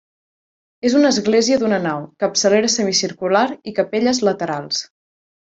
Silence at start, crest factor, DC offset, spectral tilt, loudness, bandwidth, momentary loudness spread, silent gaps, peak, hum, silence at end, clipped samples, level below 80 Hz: 0.85 s; 16 dB; under 0.1%; -3.5 dB/octave; -18 LUFS; 8 kHz; 8 LU; none; -2 dBFS; none; 0.6 s; under 0.1%; -60 dBFS